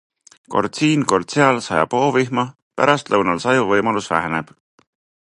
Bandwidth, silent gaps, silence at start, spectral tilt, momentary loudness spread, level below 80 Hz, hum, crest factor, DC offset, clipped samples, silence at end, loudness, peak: 11 kHz; 2.62-2.71 s; 0.5 s; -5 dB/octave; 7 LU; -54 dBFS; none; 18 dB; under 0.1%; under 0.1%; 0.85 s; -18 LUFS; 0 dBFS